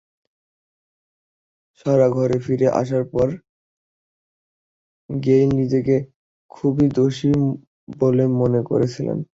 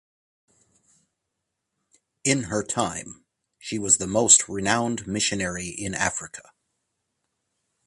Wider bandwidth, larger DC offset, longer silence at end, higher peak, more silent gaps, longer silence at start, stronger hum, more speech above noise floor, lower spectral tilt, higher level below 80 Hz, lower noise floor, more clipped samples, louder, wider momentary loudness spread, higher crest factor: second, 7.8 kHz vs 11.5 kHz; neither; second, 0.1 s vs 1.45 s; second, -4 dBFS vs 0 dBFS; first, 3.49-5.09 s, 6.16-6.49 s, 7.67-7.87 s vs none; second, 1.85 s vs 2.25 s; neither; first, over 72 dB vs 57 dB; first, -8.5 dB/octave vs -2.5 dB/octave; about the same, -52 dBFS vs -54 dBFS; first, under -90 dBFS vs -81 dBFS; neither; first, -19 LUFS vs -22 LUFS; second, 8 LU vs 20 LU; second, 16 dB vs 28 dB